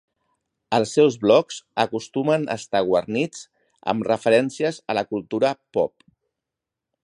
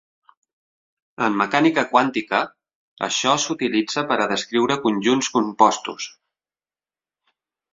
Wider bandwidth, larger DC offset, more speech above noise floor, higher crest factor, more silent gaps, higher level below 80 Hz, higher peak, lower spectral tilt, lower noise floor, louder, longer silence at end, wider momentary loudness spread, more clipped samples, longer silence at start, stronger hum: first, 11 kHz vs 7.8 kHz; neither; second, 64 dB vs over 70 dB; about the same, 20 dB vs 20 dB; second, none vs 2.75-2.96 s; about the same, -64 dBFS vs -66 dBFS; about the same, -2 dBFS vs -2 dBFS; first, -5 dB/octave vs -3.5 dB/octave; second, -86 dBFS vs under -90 dBFS; about the same, -22 LUFS vs -20 LUFS; second, 1.15 s vs 1.65 s; about the same, 9 LU vs 10 LU; neither; second, 0.7 s vs 1.2 s; neither